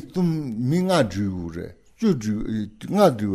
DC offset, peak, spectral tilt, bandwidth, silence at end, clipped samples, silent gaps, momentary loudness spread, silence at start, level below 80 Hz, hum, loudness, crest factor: under 0.1%; -4 dBFS; -7 dB/octave; 14.5 kHz; 0 s; under 0.1%; none; 13 LU; 0 s; -48 dBFS; none; -23 LUFS; 18 dB